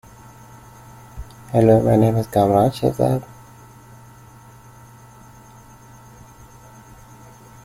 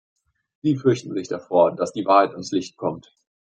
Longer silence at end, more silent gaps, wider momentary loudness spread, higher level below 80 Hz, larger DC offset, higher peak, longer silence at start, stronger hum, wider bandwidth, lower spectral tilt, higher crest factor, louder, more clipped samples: first, 4.4 s vs 0.55 s; neither; first, 25 LU vs 11 LU; first, -46 dBFS vs -68 dBFS; neither; about the same, -2 dBFS vs -2 dBFS; first, 1.15 s vs 0.65 s; neither; first, 16 kHz vs 9.2 kHz; first, -8 dB/octave vs -6.5 dB/octave; about the same, 20 dB vs 20 dB; first, -17 LUFS vs -22 LUFS; neither